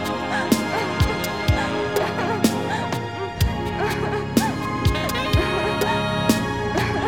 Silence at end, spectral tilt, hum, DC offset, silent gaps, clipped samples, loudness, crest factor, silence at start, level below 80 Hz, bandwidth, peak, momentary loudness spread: 0 s; -5 dB/octave; none; 0.4%; none; under 0.1%; -22 LUFS; 18 dB; 0 s; -34 dBFS; over 20 kHz; -2 dBFS; 4 LU